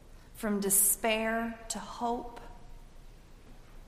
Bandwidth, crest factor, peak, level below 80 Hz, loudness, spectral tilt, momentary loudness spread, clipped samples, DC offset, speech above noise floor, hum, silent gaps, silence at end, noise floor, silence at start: 15.5 kHz; 22 dB; -12 dBFS; -52 dBFS; -29 LUFS; -2.5 dB/octave; 15 LU; under 0.1%; under 0.1%; 20 dB; none; none; 0 s; -51 dBFS; 0.05 s